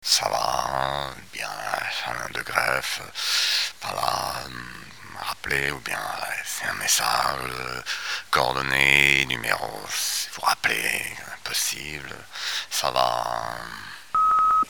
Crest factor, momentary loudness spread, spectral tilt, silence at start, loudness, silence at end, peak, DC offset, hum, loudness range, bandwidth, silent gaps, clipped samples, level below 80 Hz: 26 dB; 13 LU; -1 dB/octave; 0 s; -24 LUFS; 0 s; 0 dBFS; 0.4%; none; 5 LU; over 20 kHz; none; under 0.1%; -52 dBFS